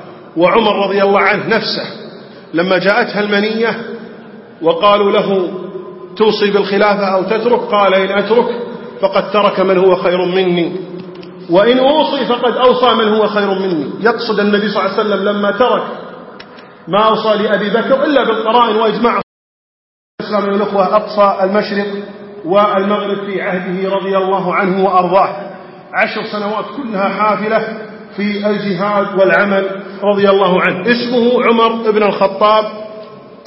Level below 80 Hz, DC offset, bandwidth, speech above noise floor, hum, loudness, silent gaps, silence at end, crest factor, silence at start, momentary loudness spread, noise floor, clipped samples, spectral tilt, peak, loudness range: -56 dBFS; under 0.1%; 5.8 kHz; 23 dB; none; -13 LUFS; 19.23-20.18 s; 0.1 s; 14 dB; 0 s; 15 LU; -35 dBFS; under 0.1%; -8.5 dB/octave; 0 dBFS; 3 LU